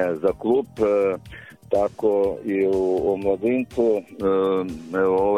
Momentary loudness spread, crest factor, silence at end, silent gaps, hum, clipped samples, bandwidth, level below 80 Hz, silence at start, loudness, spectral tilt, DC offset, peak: 5 LU; 14 dB; 0 s; none; none; under 0.1%; 11.5 kHz; -50 dBFS; 0 s; -22 LUFS; -7.5 dB/octave; under 0.1%; -8 dBFS